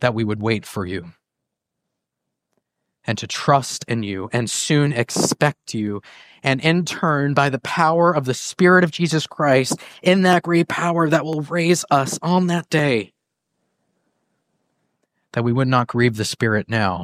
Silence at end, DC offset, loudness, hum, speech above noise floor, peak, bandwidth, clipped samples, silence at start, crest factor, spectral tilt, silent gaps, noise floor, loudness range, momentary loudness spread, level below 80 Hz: 0 s; under 0.1%; -19 LUFS; none; 62 dB; -2 dBFS; 15.5 kHz; under 0.1%; 0 s; 18 dB; -5 dB/octave; none; -81 dBFS; 8 LU; 10 LU; -60 dBFS